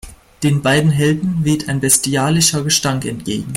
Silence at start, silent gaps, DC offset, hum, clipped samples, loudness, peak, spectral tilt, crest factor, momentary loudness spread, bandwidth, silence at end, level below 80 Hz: 0.05 s; none; under 0.1%; none; under 0.1%; -15 LUFS; 0 dBFS; -4 dB/octave; 16 dB; 8 LU; 16.5 kHz; 0 s; -44 dBFS